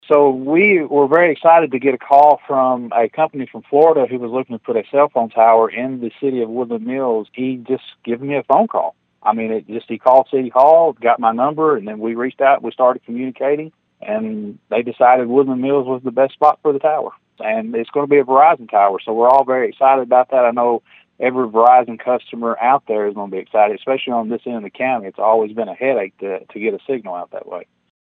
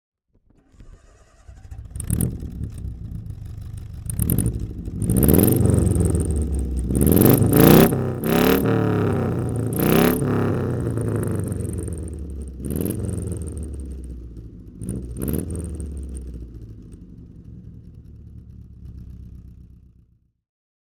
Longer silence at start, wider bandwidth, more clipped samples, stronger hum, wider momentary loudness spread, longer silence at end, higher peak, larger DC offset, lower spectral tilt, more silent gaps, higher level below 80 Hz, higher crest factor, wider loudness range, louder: second, 0.1 s vs 0.8 s; second, 4.6 kHz vs over 20 kHz; neither; neither; second, 12 LU vs 25 LU; second, 0.45 s vs 1.2 s; about the same, 0 dBFS vs -2 dBFS; neither; first, -8.5 dB/octave vs -6.5 dB/octave; neither; second, -72 dBFS vs -32 dBFS; about the same, 16 dB vs 20 dB; second, 6 LU vs 16 LU; first, -16 LUFS vs -21 LUFS